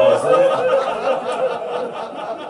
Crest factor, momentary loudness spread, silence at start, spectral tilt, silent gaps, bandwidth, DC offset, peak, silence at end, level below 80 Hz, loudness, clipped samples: 16 dB; 12 LU; 0 s; -4.5 dB/octave; none; 11 kHz; under 0.1%; -2 dBFS; 0 s; -64 dBFS; -19 LUFS; under 0.1%